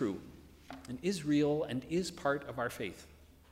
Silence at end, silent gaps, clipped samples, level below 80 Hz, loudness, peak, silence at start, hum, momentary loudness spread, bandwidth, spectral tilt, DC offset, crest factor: 0.25 s; none; under 0.1%; -62 dBFS; -35 LUFS; -18 dBFS; 0 s; none; 20 LU; 16 kHz; -5.5 dB/octave; under 0.1%; 18 dB